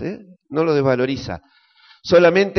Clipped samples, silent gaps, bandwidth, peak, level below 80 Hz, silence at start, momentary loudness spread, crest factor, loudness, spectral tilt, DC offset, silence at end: under 0.1%; none; 6.4 kHz; -2 dBFS; -50 dBFS; 0 s; 21 LU; 16 dB; -17 LUFS; -5 dB/octave; under 0.1%; 0 s